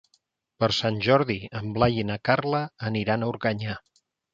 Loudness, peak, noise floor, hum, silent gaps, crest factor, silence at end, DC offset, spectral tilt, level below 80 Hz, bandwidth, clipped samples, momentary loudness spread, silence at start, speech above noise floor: -25 LUFS; -4 dBFS; -70 dBFS; none; none; 22 dB; 0.55 s; under 0.1%; -6.5 dB/octave; -52 dBFS; 7.6 kHz; under 0.1%; 10 LU; 0.6 s; 45 dB